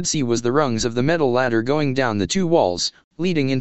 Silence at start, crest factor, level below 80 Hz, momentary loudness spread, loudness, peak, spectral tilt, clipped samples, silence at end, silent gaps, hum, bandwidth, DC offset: 0 s; 16 dB; -48 dBFS; 4 LU; -20 LUFS; -2 dBFS; -4.5 dB/octave; under 0.1%; 0 s; 3.04-3.11 s; none; 8.4 kHz; 2%